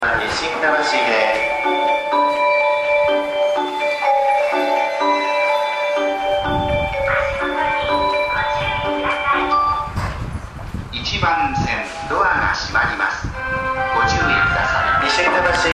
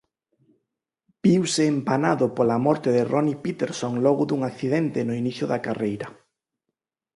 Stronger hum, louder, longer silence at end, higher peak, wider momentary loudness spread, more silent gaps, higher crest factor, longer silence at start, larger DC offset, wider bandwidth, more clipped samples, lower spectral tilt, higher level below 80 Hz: neither; first, -18 LUFS vs -23 LUFS; second, 0 s vs 1.05 s; about the same, -4 dBFS vs -6 dBFS; about the same, 6 LU vs 7 LU; neither; about the same, 14 dB vs 18 dB; second, 0 s vs 1.25 s; neither; first, 13 kHz vs 11.5 kHz; neither; second, -4.5 dB/octave vs -6 dB/octave; first, -36 dBFS vs -64 dBFS